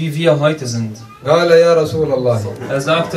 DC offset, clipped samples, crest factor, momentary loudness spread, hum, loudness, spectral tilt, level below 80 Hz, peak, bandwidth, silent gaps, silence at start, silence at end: under 0.1%; under 0.1%; 14 dB; 12 LU; none; -14 LUFS; -6 dB/octave; -50 dBFS; 0 dBFS; 13.5 kHz; none; 0 s; 0 s